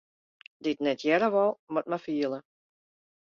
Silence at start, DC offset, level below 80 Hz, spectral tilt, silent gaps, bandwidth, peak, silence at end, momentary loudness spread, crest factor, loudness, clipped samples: 0.6 s; under 0.1%; -76 dBFS; -6 dB/octave; 1.59-1.67 s; 7.2 kHz; -12 dBFS; 0.85 s; 9 LU; 18 dB; -28 LUFS; under 0.1%